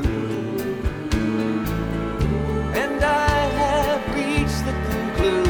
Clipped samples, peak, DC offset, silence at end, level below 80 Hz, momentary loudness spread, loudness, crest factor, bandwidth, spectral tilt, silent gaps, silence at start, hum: under 0.1%; -6 dBFS; under 0.1%; 0 s; -30 dBFS; 6 LU; -22 LUFS; 16 dB; over 20 kHz; -6 dB/octave; none; 0 s; none